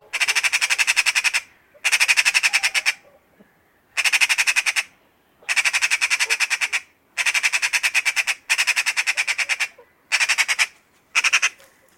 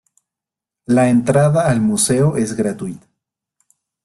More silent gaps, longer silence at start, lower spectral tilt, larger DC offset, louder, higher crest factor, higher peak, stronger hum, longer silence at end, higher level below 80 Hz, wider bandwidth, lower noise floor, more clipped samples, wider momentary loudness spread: neither; second, 0.15 s vs 0.9 s; second, 4.5 dB/octave vs -6 dB/octave; neither; second, -18 LUFS vs -15 LUFS; about the same, 20 dB vs 16 dB; about the same, -2 dBFS vs -2 dBFS; neither; second, 0.45 s vs 1.05 s; second, -72 dBFS vs -50 dBFS; first, 16.5 kHz vs 12.5 kHz; second, -59 dBFS vs -86 dBFS; neither; about the same, 8 LU vs 8 LU